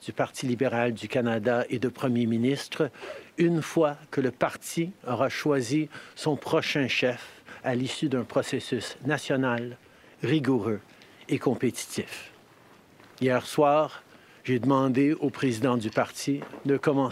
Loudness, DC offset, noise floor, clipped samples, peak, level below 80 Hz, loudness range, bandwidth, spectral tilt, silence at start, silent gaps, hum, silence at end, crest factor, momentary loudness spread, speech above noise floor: -27 LUFS; under 0.1%; -55 dBFS; under 0.1%; -8 dBFS; -70 dBFS; 4 LU; 15.5 kHz; -5.5 dB/octave; 0 s; none; none; 0 s; 18 dB; 9 LU; 29 dB